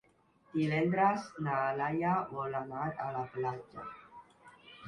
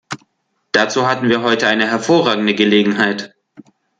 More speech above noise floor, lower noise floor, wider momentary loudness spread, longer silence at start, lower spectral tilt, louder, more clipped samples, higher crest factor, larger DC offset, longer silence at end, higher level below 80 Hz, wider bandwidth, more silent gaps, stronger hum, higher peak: second, 34 dB vs 52 dB; about the same, -68 dBFS vs -67 dBFS; first, 17 LU vs 13 LU; first, 0.55 s vs 0.1 s; first, -7.5 dB/octave vs -4.5 dB/octave; second, -34 LUFS vs -15 LUFS; neither; about the same, 20 dB vs 16 dB; neither; second, 0 s vs 0.4 s; second, -70 dBFS vs -60 dBFS; first, 11 kHz vs 9.2 kHz; neither; neither; second, -16 dBFS vs 0 dBFS